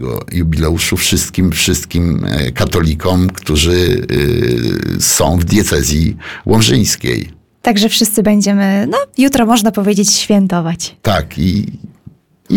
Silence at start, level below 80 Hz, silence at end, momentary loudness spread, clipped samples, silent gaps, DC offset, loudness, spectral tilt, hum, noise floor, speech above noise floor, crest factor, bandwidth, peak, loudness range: 0 s; -28 dBFS; 0 s; 7 LU; under 0.1%; none; under 0.1%; -13 LUFS; -4.5 dB/octave; none; -41 dBFS; 29 dB; 12 dB; 19 kHz; 0 dBFS; 2 LU